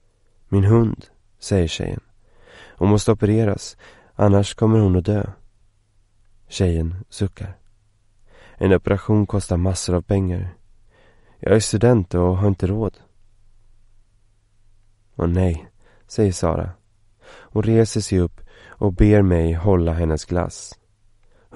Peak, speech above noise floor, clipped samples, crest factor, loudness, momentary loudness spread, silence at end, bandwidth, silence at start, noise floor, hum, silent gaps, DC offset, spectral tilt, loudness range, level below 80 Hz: 0 dBFS; 40 dB; under 0.1%; 20 dB; -20 LUFS; 14 LU; 0.8 s; 11.5 kHz; 0.5 s; -58 dBFS; none; none; under 0.1%; -7 dB/octave; 7 LU; -36 dBFS